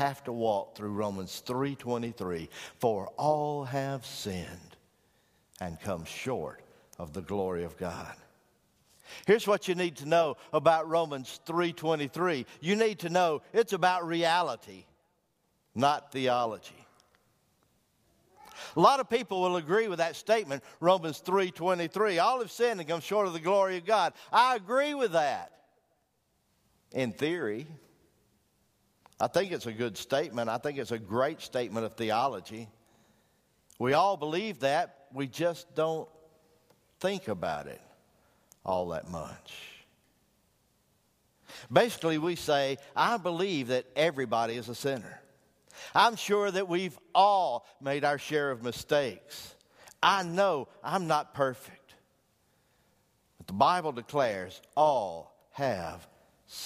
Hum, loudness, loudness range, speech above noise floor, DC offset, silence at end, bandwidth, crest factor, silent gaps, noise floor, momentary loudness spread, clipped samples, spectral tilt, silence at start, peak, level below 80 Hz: none; -30 LUFS; 9 LU; 45 dB; under 0.1%; 0 s; 15.5 kHz; 24 dB; none; -74 dBFS; 16 LU; under 0.1%; -4.5 dB/octave; 0 s; -6 dBFS; -68 dBFS